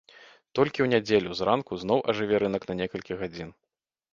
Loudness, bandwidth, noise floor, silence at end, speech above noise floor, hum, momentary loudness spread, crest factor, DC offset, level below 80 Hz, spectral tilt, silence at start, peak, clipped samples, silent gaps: -27 LUFS; 7.4 kHz; -54 dBFS; 0.65 s; 28 dB; none; 11 LU; 22 dB; under 0.1%; -58 dBFS; -6 dB/octave; 0.2 s; -6 dBFS; under 0.1%; none